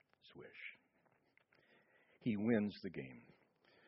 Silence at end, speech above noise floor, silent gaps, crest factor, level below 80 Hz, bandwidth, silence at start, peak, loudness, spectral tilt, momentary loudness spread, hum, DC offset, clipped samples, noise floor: 0.65 s; 38 dB; none; 22 dB; -80 dBFS; 5.6 kHz; 0.25 s; -24 dBFS; -41 LUFS; -6.5 dB/octave; 23 LU; none; under 0.1%; under 0.1%; -77 dBFS